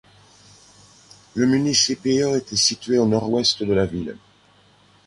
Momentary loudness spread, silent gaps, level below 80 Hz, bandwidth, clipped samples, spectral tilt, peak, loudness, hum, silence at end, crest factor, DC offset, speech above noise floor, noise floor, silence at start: 8 LU; none; -50 dBFS; 11.5 kHz; under 0.1%; -3.5 dB/octave; -4 dBFS; -20 LUFS; 50 Hz at -50 dBFS; 0.95 s; 18 dB; under 0.1%; 35 dB; -55 dBFS; 1.35 s